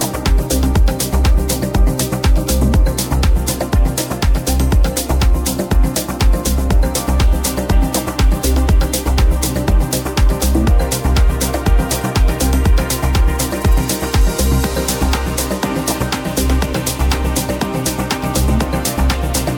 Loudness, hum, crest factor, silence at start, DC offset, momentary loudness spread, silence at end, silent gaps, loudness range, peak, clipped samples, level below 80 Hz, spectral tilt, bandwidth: -16 LUFS; none; 12 dB; 0 s; under 0.1%; 3 LU; 0 s; none; 2 LU; -2 dBFS; under 0.1%; -16 dBFS; -5 dB/octave; 19 kHz